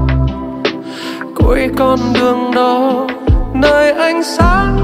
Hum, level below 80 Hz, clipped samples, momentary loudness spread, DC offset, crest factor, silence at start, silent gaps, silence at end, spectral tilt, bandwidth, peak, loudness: none; -20 dBFS; under 0.1%; 8 LU; under 0.1%; 12 dB; 0 s; none; 0 s; -6.5 dB/octave; 16 kHz; 0 dBFS; -13 LUFS